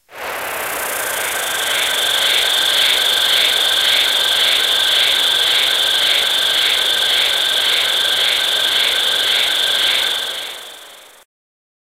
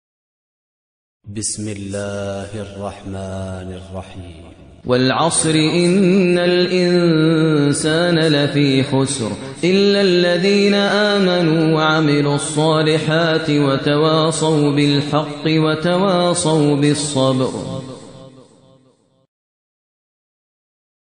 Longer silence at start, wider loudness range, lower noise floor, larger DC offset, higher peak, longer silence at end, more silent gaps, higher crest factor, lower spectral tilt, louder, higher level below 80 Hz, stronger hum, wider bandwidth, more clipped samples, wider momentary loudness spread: second, 0.1 s vs 1.25 s; second, 3 LU vs 12 LU; second, -40 dBFS vs -56 dBFS; second, under 0.1% vs 0.1%; about the same, 0 dBFS vs -2 dBFS; second, 0.85 s vs 2.75 s; neither; about the same, 16 dB vs 14 dB; second, 1.5 dB/octave vs -5 dB/octave; about the same, -13 LUFS vs -15 LUFS; about the same, -56 dBFS vs -52 dBFS; neither; first, 16 kHz vs 10 kHz; neither; second, 9 LU vs 14 LU